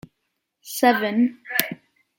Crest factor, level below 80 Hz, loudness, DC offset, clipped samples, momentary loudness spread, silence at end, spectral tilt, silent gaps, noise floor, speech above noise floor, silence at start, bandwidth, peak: 24 dB; -70 dBFS; -21 LUFS; under 0.1%; under 0.1%; 14 LU; 0.45 s; -3.5 dB/octave; none; -77 dBFS; 56 dB; 0.65 s; 17 kHz; 0 dBFS